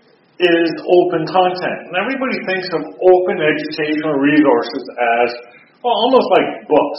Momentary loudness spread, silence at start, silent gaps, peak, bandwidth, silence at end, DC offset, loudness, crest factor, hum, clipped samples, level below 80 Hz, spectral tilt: 8 LU; 0.4 s; none; 0 dBFS; 5.8 kHz; 0 s; under 0.1%; -15 LUFS; 16 dB; none; under 0.1%; -62 dBFS; -3 dB/octave